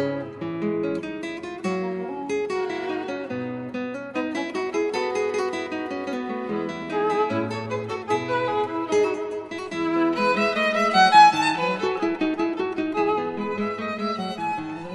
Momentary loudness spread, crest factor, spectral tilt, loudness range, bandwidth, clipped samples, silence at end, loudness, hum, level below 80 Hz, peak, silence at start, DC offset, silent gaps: 9 LU; 20 dB; -5 dB/octave; 9 LU; 11.5 kHz; under 0.1%; 0 s; -24 LUFS; none; -64 dBFS; -4 dBFS; 0 s; under 0.1%; none